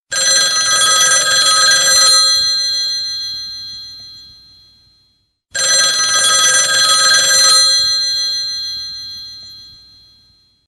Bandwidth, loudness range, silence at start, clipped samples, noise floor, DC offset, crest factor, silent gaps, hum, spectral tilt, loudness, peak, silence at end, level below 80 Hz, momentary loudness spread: 15.5 kHz; 8 LU; 0.1 s; under 0.1%; -60 dBFS; under 0.1%; 14 dB; none; none; 3 dB/octave; -10 LUFS; 0 dBFS; 1 s; -54 dBFS; 18 LU